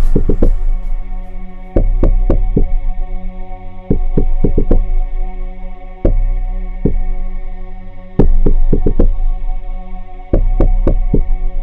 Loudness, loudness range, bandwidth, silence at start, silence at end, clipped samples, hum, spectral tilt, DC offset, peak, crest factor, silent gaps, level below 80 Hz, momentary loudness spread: -19 LUFS; 3 LU; 2.4 kHz; 0 s; 0 s; under 0.1%; none; -11 dB/octave; under 0.1%; 0 dBFS; 10 dB; none; -12 dBFS; 16 LU